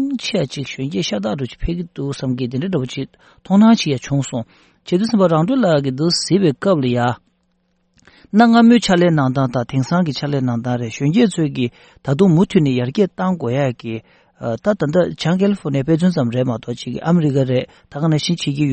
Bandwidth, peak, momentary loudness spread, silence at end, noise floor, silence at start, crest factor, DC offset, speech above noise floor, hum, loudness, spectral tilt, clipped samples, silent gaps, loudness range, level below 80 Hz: 8.8 kHz; 0 dBFS; 12 LU; 0 s; -64 dBFS; 0 s; 16 dB; under 0.1%; 47 dB; none; -17 LUFS; -6.5 dB/octave; under 0.1%; none; 3 LU; -44 dBFS